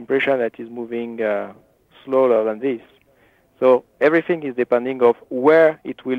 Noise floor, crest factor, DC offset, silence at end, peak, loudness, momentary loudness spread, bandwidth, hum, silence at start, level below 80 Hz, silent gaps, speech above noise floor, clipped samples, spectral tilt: -57 dBFS; 16 dB; under 0.1%; 0 s; -4 dBFS; -19 LUFS; 12 LU; 5 kHz; none; 0 s; -68 dBFS; none; 39 dB; under 0.1%; -7.5 dB/octave